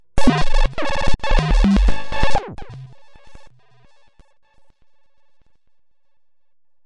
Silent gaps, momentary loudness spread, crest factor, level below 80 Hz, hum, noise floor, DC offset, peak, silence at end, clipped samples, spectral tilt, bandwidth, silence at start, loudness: none; 20 LU; 12 dB; -22 dBFS; none; -76 dBFS; under 0.1%; -4 dBFS; 3.4 s; under 0.1%; -6 dB/octave; 10.5 kHz; 0.15 s; -20 LUFS